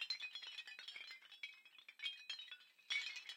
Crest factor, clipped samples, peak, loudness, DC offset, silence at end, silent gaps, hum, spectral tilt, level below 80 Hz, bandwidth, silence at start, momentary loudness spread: 24 dB; under 0.1%; -26 dBFS; -48 LUFS; under 0.1%; 0 s; none; none; 4 dB/octave; under -90 dBFS; 16.5 kHz; 0 s; 13 LU